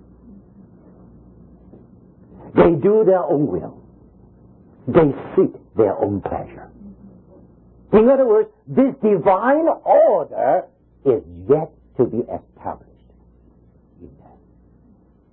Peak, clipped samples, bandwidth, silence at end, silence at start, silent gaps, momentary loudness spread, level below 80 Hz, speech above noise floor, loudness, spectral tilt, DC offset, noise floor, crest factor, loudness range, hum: -2 dBFS; under 0.1%; 4.1 kHz; 1.25 s; 2.45 s; none; 17 LU; -48 dBFS; 36 dB; -18 LUFS; -13 dB/octave; under 0.1%; -53 dBFS; 18 dB; 8 LU; none